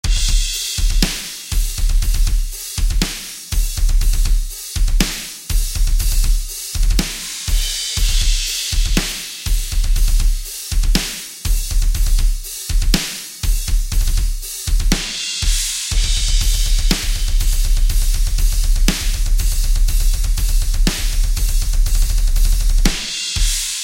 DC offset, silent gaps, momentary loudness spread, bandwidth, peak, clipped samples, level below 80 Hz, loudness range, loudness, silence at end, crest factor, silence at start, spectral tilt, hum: under 0.1%; none; 5 LU; 16.5 kHz; 0 dBFS; under 0.1%; -16 dBFS; 2 LU; -20 LUFS; 0 s; 16 dB; 0.05 s; -2.5 dB/octave; none